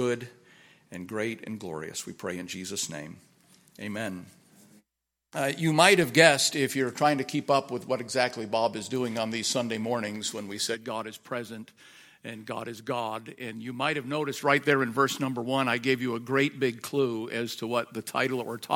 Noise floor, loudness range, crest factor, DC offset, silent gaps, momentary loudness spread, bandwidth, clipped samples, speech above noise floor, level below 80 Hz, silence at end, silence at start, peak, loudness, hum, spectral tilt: -84 dBFS; 12 LU; 28 dB; under 0.1%; none; 14 LU; 17 kHz; under 0.1%; 56 dB; -72 dBFS; 0 s; 0 s; -2 dBFS; -28 LUFS; none; -3.5 dB/octave